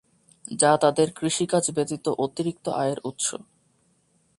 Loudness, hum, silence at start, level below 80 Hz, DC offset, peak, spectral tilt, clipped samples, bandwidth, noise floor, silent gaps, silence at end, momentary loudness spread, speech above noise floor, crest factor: -24 LUFS; none; 0.5 s; -66 dBFS; under 0.1%; -4 dBFS; -4 dB/octave; under 0.1%; 11.5 kHz; -66 dBFS; none; 0.95 s; 9 LU; 42 dB; 20 dB